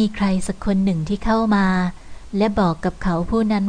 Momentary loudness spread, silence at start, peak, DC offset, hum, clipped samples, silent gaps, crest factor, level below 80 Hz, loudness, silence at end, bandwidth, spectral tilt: 6 LU; 0 s; -6 dBFS; under 0.1%; none; under 0.1%; none; 12 dB; -34 dBFS; -20 LUFS; 0 s; 10 kHz; -7 dB/octave